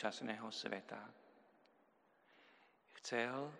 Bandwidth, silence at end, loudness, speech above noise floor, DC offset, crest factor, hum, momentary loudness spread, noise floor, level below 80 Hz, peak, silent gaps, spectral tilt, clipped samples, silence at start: 11.5 kHz; 0 s; -45 LUFS; 29 dB; under 0.1%; 24 dB; none; 15 LU; -74 dBFS; under -90 dBFS; -24 dBFS; none; -3.5 dB/octave; under 0.1%; 0 s